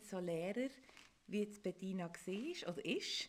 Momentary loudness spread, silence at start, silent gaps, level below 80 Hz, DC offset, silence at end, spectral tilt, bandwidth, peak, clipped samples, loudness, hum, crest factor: 8 LU; 0 s; none; -80 dBFS; under 0.1%; 0 s; -4.5 dB/octave; 16 kHz; -28 dBFS; under 0.1%; -44 LUFS; none; 16 dB